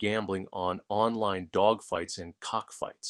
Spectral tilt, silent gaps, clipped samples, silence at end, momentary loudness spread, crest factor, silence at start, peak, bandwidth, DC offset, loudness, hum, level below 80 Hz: -4.5 dB/octave; none; under 0.1%; 0 s; 10 LU; 20 dB; 0 s; -10 dBFS; 12.5 kHz; under 0.1%; -31 LUFS; none; -64 dBFS